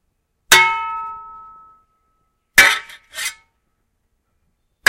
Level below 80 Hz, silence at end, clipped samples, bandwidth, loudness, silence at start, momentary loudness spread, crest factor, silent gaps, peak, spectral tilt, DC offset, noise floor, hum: -50 dBFS; 1.55 s; under 0.1%; 16 kHz; -14 LUFS; 0.5 s; 20 LU; 20 dB; none; 0 dBFS; 1 dB/octave; under 0.1%; -68 dBFS; none